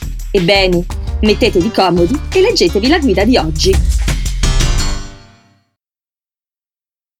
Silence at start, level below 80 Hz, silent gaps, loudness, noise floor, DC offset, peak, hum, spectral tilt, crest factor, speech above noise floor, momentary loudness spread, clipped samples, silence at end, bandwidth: 0 s; -20 dBFS; none; -13 LUFS; under -90 dBFS; under 0.1%; 0 dBFS; none; -5 dB/octave; 14 dB; over 79 dB; 7 LU; under 0.1%; 2 s; 16.5 kHz